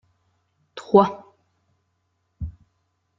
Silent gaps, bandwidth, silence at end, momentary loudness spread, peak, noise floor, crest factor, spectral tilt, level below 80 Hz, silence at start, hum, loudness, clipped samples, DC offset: none; 7.4 kHz; 0.7 s; 24 LU; -2 dBFS; -72 dBFS; 24 dB; -6.5 dB/octave; -48 dBFS; 0.75 s; none; -19 LUFS; under 0.1%; under 0.1%